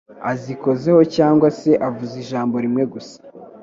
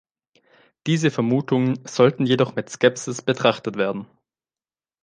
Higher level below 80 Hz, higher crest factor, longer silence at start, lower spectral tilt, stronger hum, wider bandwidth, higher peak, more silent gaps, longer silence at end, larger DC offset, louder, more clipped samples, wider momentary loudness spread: first, -60 dBFS vs -66 dBFS; about the same, 18 dB vs 20 dB; second, 0.1 s vs 0.85 s; first, -7.5 dB/octave vs -5.5 dB/octave; neither; second, 7.6 kHz vs 10 kHz; about the same, 0 dBFS vs -2 dBFS; neither; second, 0.05 s vs 1 s; neither; first, -18 LUFS vs -21 LUFS; neither; first, 12 LU vs 7 LU